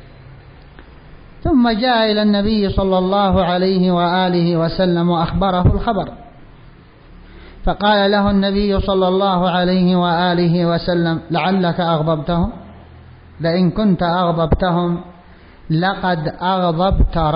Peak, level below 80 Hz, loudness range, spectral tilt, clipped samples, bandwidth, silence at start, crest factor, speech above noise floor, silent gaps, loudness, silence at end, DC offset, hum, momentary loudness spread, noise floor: -4 dBFS; -30 dBFS; 3 LU; -12 dB/octave; under 0.1%; 5.2 kHz; 0 s; 12 dB; 27 dB; none; -16 LUFS; 0 s; under 0.1%; none; 5 LU; -42 dBFS